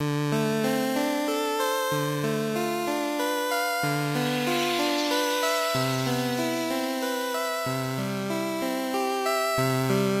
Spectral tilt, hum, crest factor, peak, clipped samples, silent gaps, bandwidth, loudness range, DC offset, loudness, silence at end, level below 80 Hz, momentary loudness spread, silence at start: -4.5 dB/octave; none; 14 dB; -12 dBFS; under 0.1%; none; 16 kHz; 2 LU; under 0.1%; -26 LUFS; 0 s; -66 dBFS; 4 LU; 0 s